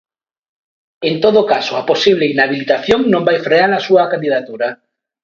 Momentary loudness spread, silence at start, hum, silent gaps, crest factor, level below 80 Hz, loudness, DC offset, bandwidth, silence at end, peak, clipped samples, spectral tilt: 8 LU; 1 s; none; none; 14 dB; -52 dBFS; -14 LUFS; under 0.1%; 7.6 kHz; 0.5 s; 0 dBFS; under 0.1%; -5.5 dB/octave